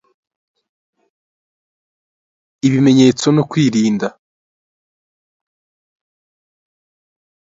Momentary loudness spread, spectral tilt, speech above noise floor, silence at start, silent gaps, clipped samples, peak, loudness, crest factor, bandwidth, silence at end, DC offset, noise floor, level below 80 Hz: 9 LU; -6 dB/octave; over 77 dB; 2.65 s; none; under 0.1%; 0 dBFS; -14 LUFS; 20 dB; 7.8 kHz; 3.5 s; under 0.1%; under -90 dBFS; -60 dBFS